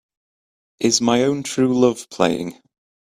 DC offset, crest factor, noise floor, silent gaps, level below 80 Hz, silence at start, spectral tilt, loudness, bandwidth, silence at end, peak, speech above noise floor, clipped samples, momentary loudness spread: under 0.1%; 20 dB; under -90 dBFS; none; -58 dBFS; 0.8 s; -4 dB/octave; -19 LUFS; 14.5 kHz; 0.5 s; 0 dBFS; over 72 dB; under 0.1%; 7 LU